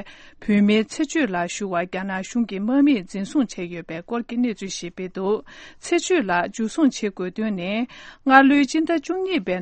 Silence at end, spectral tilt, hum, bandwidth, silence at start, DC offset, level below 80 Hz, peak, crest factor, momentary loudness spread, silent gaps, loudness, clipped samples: 0 s; -5 dB/octave; none; 8.8 kHz; 0 s; under 0.1%; -56 dBFS; 0 dBFS; 22 dB; 13 LU; none; -22 LUFS; under 0.1%